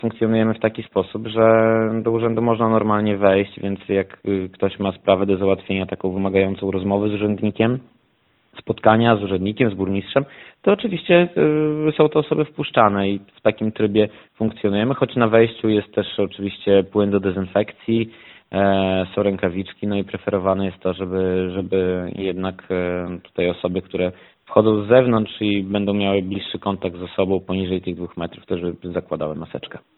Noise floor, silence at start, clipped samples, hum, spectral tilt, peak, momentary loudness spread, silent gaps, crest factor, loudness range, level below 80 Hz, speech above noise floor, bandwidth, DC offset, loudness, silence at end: -62 dBFS; 0.05 s; under 0.1%; none; -11.5 dB/octave; 0 dBFS; 10 LU; none; 20 dB; 4 LU; -54 dBFS; 43 dB; 4.2 kHz; under 0.1%; -20 LUFS; 0.2 s